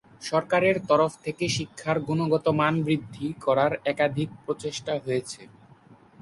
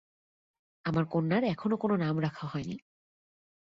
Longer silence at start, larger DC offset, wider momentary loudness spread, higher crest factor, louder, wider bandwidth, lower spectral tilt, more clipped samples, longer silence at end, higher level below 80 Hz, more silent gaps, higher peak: second, 0.2 s vs 0.85 s; neither; about the same, 9 LU vs 10 LU; about the same, 18 dB vs 16 dB; first, -26 LUFS vs -31 LUFS; first, 11.5 kHz vs 7.4 kHz; second, -5.5 dB/octave vs -8.5 dB/octave; neither; second, 0.3 s vs 1 s; first, -60 dBFS vs -66 dBFS; neither; first, -8 dBFS vs -16 dBFS